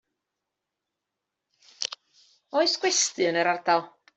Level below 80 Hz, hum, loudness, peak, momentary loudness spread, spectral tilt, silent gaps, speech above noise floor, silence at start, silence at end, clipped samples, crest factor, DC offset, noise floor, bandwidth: -82 dBFS; none; -25 LUFS; -8 dBFS; 11 LU; -1.5 dB/octave; none; 61 dB; 1.8 s; 0.3 s; under 0.1%; 20 dB; under 0.1%; -85 dBFS; 8.2 kHz